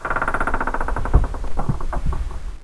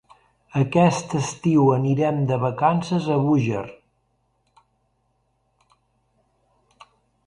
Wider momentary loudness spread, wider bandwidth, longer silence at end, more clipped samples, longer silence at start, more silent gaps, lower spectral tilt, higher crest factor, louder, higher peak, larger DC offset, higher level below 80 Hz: about the same, 7 LU vs 8 LU; about the same, 11 kHz vs 11 kHz; second, 0 s vs 3.55 s; neither; second, 0 s vs 0.55 s; neither; about the same, -7 dB/octave vs -7 dB/octave; about the same, 20 dB vs 18 dB; second, -24 LUFS vs -21 LUFS; first, 0 dBFS vs -4 dBFS; neither; first, -22 dBFS vs -60 dBFS